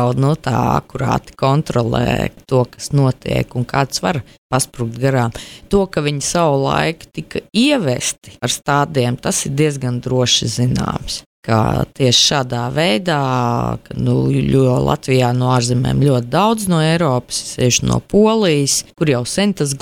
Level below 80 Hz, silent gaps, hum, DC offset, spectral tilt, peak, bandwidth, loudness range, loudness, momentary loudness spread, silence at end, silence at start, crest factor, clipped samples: -38 dBFS; 4.38-4.50 s, 11.26-11.43 s; none; under 0.1%; -5 dB/octave; -2 dBFS; 16 kHz; 3 LU; -16 LUFS; 7 LU; 0.05 s; 0 s; 14 dB; under 0.1%